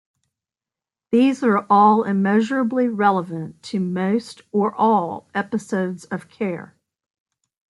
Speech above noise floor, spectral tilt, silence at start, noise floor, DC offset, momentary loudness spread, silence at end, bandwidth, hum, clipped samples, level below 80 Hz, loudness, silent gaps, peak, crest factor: 70 dB; -7 dB/octave; 1.1 s; -89 dBFS; under 0.1%; 12 LU; 1.1 s; 11.5 kHz; none; under 0.1%; -70 dBFS; -20 LUFS; none; -4 dBFS; 18 dB